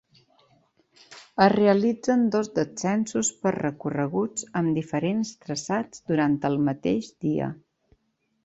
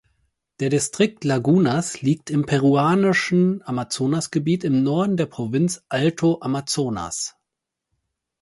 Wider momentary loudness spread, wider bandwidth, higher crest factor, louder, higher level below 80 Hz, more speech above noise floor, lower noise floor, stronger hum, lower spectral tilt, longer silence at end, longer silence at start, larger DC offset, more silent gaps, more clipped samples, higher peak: about the same, 9 LU vs 8 LU; second, 8.2 kHz vs 11.5 kHz; first, 22 dB vs 16 dB; second, -25 LUFS vs -21 LUFS; about the same, -62 dBFS vs -58 dBFS; second, 48 dB vs 63 dB; second, -73 dBFS vs -83 dBFS; neither; about the same, -5.5 dB/octave vs -5.5 dB/octave; second, 0.9 s vs 1.1 s; first, 1.1 s vs 0.6 s; neither; neither; neither; about the same, -4 dBFS vs -4 dBFS